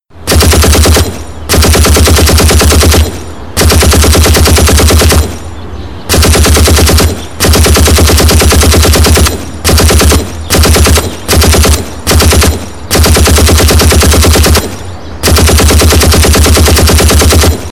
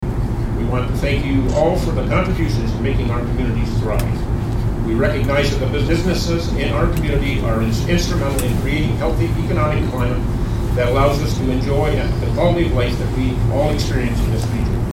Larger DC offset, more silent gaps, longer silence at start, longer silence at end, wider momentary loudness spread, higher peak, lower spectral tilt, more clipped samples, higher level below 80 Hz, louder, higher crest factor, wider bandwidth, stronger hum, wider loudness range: first, 4% vs under 0.1%; neither; about the same, 0 s vs 0 s; about the same, 0 s vs 0 s; first, 7 LU vs 4 LU; about the same, 0 dBFS vs 0 dBFS; second, -4 dB/octave vs -6.5 dB/octave; first, 2% vs under 0.1%; first, -10 dBFS vs -22 dBFS; first, -5 LUFS vs -18 LUFS; second, 6 dB vs 16 dB; first, 18 kHz vs 16 kHz; neither; about the same, 1 LU vs 1 LU